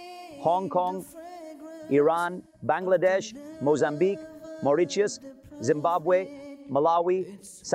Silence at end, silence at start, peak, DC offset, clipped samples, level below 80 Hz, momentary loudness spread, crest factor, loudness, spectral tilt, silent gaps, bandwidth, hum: 0 s; 0 s; -12 dBFS; under 0.1%; under 0.1%; -70 dBFS; 19 LU; 16 dB; -26 LUFS; -5.5 dB/octave; none; 15.5 kHz; none